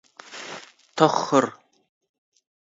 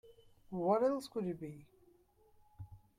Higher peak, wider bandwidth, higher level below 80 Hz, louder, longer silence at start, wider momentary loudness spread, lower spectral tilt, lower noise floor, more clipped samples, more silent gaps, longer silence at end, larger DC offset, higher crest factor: first, 0 dBFS vs -20 dBFS; second, 8 kHz vs 15.5 kHz; second, -76 dBFS vs -70 dBFS; first, -21 LUFS vs -37 LUFS; first, 0.3 s vs 0.05 s; second, 20 LU vs 24 LU; second, -4.5 dB/octave vs -7.5 dB/octave; second, -42 dBFS vs -68 dBFS; neither; neither; first, 1.3 s vs 0.2 s; neither; first, 26 dB vs 20 dB